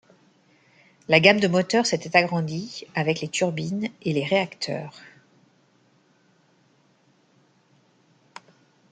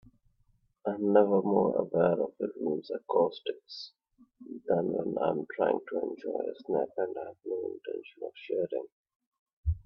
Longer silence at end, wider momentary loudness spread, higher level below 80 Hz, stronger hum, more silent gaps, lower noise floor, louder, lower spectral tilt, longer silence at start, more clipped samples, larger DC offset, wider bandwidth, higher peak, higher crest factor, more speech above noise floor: first, 3.85 s vs 0.05 s; about the same, 14 LU vs 16 LU; second, -68 dBFS vs -52 dBFS; neither; second, none vs 8.92-9.04 s, 9.16-9.20 s, 9.27-9.32 s, 9.39-9.46 s, 9.53-9.64 s; second, -62 dBFS vs -70 dBFS; first, -22 LUFS vs -31 LUFS; second, -4.5 dB/octave vs -9 dB/octave; first, 1.1 s vs 0.85 s; neither; neither; first, 9.4 kHz vs 6.2 kHz; first, 0 dBFS vs -10 dBFS; about the same, 26 dB vs 22 dB; about the same, 39 dB vs 39 dB